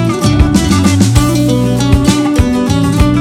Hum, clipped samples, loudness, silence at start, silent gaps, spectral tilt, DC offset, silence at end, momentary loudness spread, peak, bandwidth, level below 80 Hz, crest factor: none; 1%; -10 LUFS; 0 s; none; -6 dB/octave; under 0.1%; 0 s; 2 LU; 0 dBFS; 16.5 kHz; -20 dBFS; 10 dB